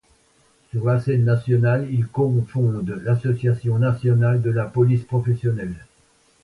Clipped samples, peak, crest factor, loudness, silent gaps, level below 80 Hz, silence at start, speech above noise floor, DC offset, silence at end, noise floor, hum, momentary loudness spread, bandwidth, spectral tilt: under 0.1%; -6 dBFS; 14 dB; -21 LUFS; none; -52 dBFS; 0.75 s; 40 dB; under 0.1%; 0.6 s; -59 dBFS; none; 6 LU; 4.6 kHz; -10 dB/octave